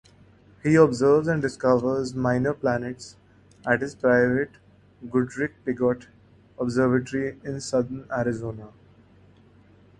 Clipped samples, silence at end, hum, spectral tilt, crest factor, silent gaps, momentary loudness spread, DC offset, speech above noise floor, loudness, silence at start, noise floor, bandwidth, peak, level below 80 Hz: under 0.1%; 1.3 s; none; -7 dB/octave; 22 dB; none; 14 LU; under 0.1%; 31 dB; -24 LUFS; 0.65 s; -54 dBFS; 11 kHz; -4 dBFS; -56 dBFS